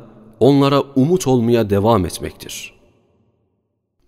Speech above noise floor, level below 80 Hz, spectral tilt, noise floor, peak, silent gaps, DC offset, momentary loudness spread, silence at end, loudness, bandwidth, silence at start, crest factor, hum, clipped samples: 54 dB; -46 dBFS; -6.5 dB/octave; -70 dBFS; -2 dBFS; none; under 0.1%; 16 LU; 1.4 s; -15 LUFS; 16 kHz; 0 s; 16 dB; none; under 0.1%